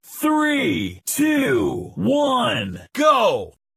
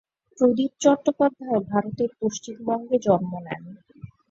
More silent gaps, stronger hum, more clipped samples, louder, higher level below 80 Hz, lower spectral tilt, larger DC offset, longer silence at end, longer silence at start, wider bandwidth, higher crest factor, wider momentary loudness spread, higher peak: neither; neither; neither; first, -20 LUFS vs -24 LUFS; first, -54 dBFS vs -64 dBFS; second, -4 dB/octave vs -6 dB/octave; neither; about the same, 0.25 s vs 0.25 s; second, 0.1 s vs 0.4 s; first, 15.5 kHz vs 7.8 kHz; about the same, 16 dB vs 20 dB; second, 8 LU vs 12 LU; about the same, -4 dBFS vs -4 dBFS